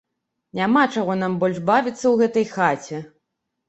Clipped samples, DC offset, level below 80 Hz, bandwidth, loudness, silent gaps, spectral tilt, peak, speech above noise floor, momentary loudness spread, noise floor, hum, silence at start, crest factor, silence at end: under 0.1%; under 0.1%; -64 dBFS; 8.2 kHz; -20 LUFS; none; -6 dB/octave; -2 dBFS; 58 dB; 12 LU; -78 dBFS; none; 0.55 s; 18 dB; 0.6 s